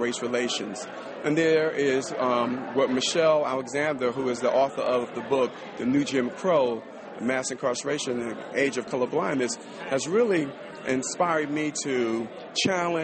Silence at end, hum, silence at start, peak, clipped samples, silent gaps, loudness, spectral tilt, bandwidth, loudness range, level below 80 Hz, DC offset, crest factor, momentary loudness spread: 0 s; none; 0 s; -12 dBFS; under 0.1%; none; -26 LUFS; -4 dB/octave; 8.8 kHz; 3 LU; -68 dBFS; under 0.1%; 14 dB; 8 LU